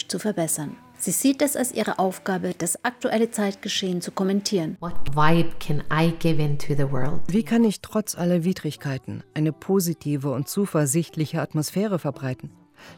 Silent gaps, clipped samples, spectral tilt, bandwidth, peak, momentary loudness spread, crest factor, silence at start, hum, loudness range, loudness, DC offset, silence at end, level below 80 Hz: none; under 0.1%; -5 dB/octave; 19 kHz; -4 dBFS; 8 LU; 18 dB; 0 s; none; 2 LU; -24 LUFS; under 0.1%; 0 s; -46 dBFS